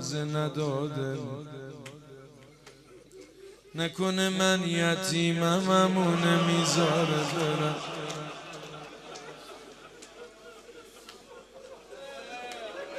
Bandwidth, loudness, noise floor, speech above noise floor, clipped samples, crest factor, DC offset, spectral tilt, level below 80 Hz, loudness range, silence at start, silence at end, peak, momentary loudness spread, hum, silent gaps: 14.5 kHz; -28 LUFS; -53 dBFS; 26 dB; under 0.1%; 22 dB; under 0.1%; -4.5 dB/octave; -68 dBFS; 20 LU; 0 s; 0 s; -10 dBFS; 24 LU; none; none